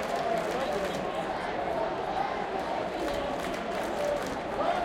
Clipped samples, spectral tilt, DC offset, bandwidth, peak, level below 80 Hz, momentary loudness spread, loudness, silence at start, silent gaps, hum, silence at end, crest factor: under 0.1%; -4.5 dB/octave; under 0.1%; 17 kHz; -16 dBFS; -52 dBFS; 3 LU; -31 LUFS; 0 s; none; none; 0 s; 14 dB